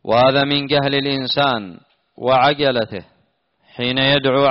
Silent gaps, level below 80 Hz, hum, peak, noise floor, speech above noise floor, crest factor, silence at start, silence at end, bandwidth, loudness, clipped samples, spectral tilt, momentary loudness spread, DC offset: none; -52 dBFS; none; -2 dBFS; -63 dBFS; 46 dB; 14 dB; 0.05 s; 0 s; 6 kHz; -17 LUFS; under 0.1%; -2.5 dB/octave; 11 LU; under 0.1%